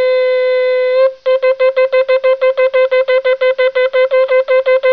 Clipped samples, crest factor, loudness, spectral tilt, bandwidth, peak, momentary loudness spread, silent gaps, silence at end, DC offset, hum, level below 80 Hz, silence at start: under 0.1%; 8 dB; -12 LUFS; -2 dB/octave; 4.9 kHz; -4 dBFS; 2 LU; none; 0 s; 0.4%; none; -64 dBFS; 0 s